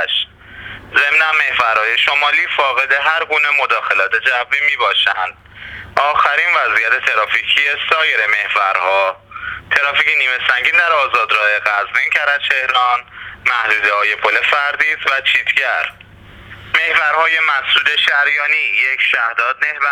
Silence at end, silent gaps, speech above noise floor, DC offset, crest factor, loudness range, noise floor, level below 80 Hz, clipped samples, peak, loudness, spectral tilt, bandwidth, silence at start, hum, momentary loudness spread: 0 s; none; 24 dB; under 0.1%; 16 dB; 1 LU; -39 dBFS; -52 dBFS; under 0.1%; 0 dBFS; -13 LUFS; -1 dB/octave; 18.5 kHz; 0 s; none; 7 LU